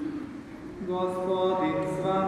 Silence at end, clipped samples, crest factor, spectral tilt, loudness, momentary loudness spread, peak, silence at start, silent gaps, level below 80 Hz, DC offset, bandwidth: 0 s; under 0.1%; 14 dB; -7 dB/octave; -29 LUFS; 14 LU; -14 dBFS; 0 s; none; -58 dBFS; under 0.1%; 12.5 kHz